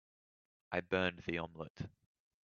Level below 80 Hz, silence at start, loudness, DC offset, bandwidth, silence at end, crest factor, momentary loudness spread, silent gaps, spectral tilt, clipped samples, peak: -70 dBFS; 0.7 s; -39 LUFS; under 0.1%; 7 kHz; 0.55 s; 24 dB; 13 LU; 1.70-1.75 s; -3.5 dB/octave; under 0.1%; -18 dBFS